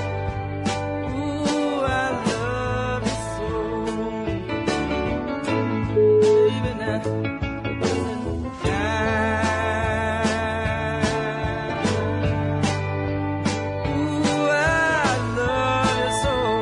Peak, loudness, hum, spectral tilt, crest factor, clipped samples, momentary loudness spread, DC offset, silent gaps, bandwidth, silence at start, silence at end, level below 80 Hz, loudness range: -6 dBFS; -23 LUFS; none; -5.5 dB/octave; 16 dB; under 0.1%; 8 LU; under 0.1%; none; 11 kHz; 0 s; 0 s; -40 dBFS; 3 LU